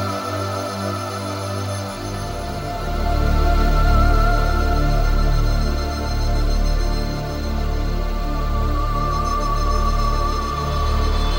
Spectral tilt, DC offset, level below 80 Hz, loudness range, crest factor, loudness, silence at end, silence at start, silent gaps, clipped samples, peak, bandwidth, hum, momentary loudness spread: -6 dB/octave; under 0.1%; -20 dBFS; 4 LU; 14 dB; -22 LUFS; 0 s; 0 s; none; under 0.1%; -6 dBFS; 16.5 kHz; none; 7 LU